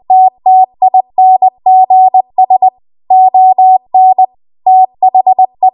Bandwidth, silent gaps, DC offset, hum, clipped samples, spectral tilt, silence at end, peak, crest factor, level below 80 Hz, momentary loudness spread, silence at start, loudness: 1.1 kHz; none; under 0.1%; none; under 0.1%; -9.5 dB/octave; 0.05 s; 0 dBFS; 6 dB; -66 dBFS; 4 LU; 0.1 s; -8 LUFS